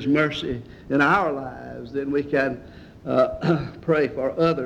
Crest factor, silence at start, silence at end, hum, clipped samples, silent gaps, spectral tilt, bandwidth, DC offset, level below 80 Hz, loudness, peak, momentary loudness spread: 16 dB; 0 s; 0 s; none; under 0.1%; none; -7 dB/octave; 9.4 kHz; under 0.1%; -50 dBFS; -23 LUFS; -6 dBFS; 15 LU